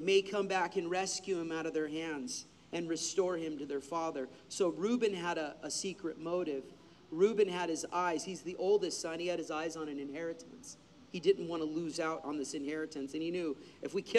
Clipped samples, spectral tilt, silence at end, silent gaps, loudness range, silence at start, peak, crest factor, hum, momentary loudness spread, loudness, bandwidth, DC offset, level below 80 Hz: under 0.1%; -3.5 dB/octave; 0 s; none; 3 LU; 0 s; -16 dBFS; 20 dB; none; 11 LU; -36 LUFS; 12.5 kHz; under 0.1%; -76 dBFS